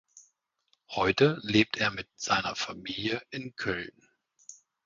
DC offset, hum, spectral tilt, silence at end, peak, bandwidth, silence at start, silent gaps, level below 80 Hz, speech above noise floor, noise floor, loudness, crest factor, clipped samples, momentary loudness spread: under 0.1%; none; -4.5 dB/octave; 0.35 s; -8 dBFS; 7.6 kHz; 0.15 s; none; -60 dBFS; 45 dB; -74 dBFS; -29 LUFS; 24 dB; under 0.1%; 18 LU